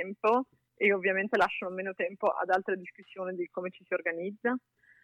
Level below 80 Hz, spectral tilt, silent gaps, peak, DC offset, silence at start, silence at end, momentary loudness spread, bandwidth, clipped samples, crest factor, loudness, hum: -76 dBFS; -6 dB/octave; none; -14 dBFS; under 0.1%; 0 s; 0.45 s; 11 LU; 11 kHz; under 0.1%; 18 dB; -31 LUFS; none